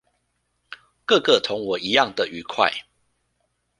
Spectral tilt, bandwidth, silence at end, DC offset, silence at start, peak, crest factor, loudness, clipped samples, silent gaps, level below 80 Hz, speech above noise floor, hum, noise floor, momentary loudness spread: -3 dB/octave; 11 kHz; 1 s; under 0.1%; 0.7 s; -2 dBFS; 22 dB; -21 LUFS; under 0.1%; none; -64 dBFS; 51 dB; 60 Hz at -55 dBFS; -72 dBFS; 10 LU